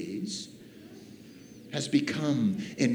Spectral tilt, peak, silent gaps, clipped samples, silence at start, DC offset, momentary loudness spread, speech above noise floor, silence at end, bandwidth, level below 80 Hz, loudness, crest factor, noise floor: -5 dB/octave; -12 dBFS; none; under 0.1%; 0 s; under 0.1%; 22 LU; 22 dB; 0 s; 15 kHz; -74 dBFS; -30 LUFS; 20 dB; -49 dBFS